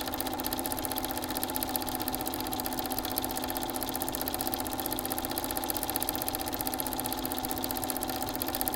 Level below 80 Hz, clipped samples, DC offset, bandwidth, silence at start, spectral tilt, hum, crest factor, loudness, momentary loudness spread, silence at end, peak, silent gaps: -50 dBFS; under 0.1%; under 0.1%; 17.5 kHz; 0 s; -3 dB/octave; none; 28 dB; -32 LUFS; 2 LU; 0 s; -6 dBFS; none